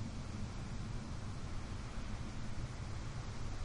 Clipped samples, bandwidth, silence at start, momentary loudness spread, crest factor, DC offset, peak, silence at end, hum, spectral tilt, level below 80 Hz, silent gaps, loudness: under 0.1%; 11 kHz; 0 s; 1 LU; 12 dB; under 0.1%; -30 dBFS; 0 s; none; -5.5 dB/octave; -46 dBFS; none; -46 LUFS